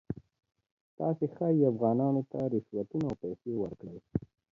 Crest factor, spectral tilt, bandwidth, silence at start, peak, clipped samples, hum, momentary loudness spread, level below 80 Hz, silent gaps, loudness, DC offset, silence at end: 18 dB; -11.5 dB/octave; 7.2 kHz; 0.1 s; -14 dBFS; under 0.1%; none; 12 LU; -62 dBFS; 0.71-0.98 s; -32 LUFS; under 0.1%; 0.35 s